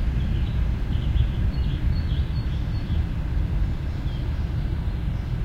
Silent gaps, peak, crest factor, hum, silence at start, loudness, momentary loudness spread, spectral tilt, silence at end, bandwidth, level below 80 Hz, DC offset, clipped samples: none; -10 dBFS; 14 dB; none; 0 s; -27 LUFS; 4 LU; -8 dB/octave; 0 s; 6.6 kHz; -26 dBFS; under 0.1%; under 0.1%